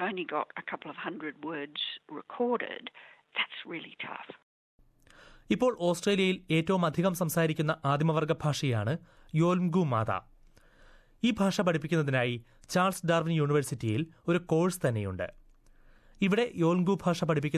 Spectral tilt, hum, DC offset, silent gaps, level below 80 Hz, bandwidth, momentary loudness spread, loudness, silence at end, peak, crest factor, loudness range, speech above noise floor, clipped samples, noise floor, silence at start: -6 dB/octave; none; under 0.1%; 4.43-4.79 s; -60 dBFS; 14.5 kHz; 12 LU; -30 LUFS; 0 s; -14 dBFS; 16 dB; 7 LU; 29 dB; under 0.1%; -58 dBFS; 0 s